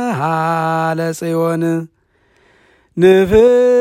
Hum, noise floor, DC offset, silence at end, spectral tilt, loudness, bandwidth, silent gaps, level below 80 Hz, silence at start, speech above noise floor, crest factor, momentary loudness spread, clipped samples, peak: none; -56 dBFS; under 0.1%; 0 s; -7 dB/octave; -14 LUFS; 16 kHz; none; -42 dBFS; 0 s; 43 dB; 14 dB; 11 LU; under 0.1%; 0 dBFS